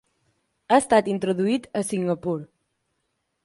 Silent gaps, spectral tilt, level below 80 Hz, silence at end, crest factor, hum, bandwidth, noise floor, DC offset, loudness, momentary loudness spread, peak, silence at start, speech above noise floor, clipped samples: none; -5.5 dB/octave; -62 dBFS; 1 s; 20 dB; none; 11.5 kHz; -76 dBFS; under 0.1%; -23 LUFS; 9 LU; -4 dBFS; 0.7 s; 53 dB; under 0.1%